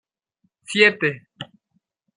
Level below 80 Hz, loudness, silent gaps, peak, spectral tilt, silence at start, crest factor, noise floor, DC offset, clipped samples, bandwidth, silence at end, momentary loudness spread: -70 dBFS; -18 LUFS; none; -2 dBFS; -4 dB/octave; 0.7 s; 24 dB; -71 dBFS; under 0.1%; under 0.1%; 10.5 kHz; 0.75 s; 23 LU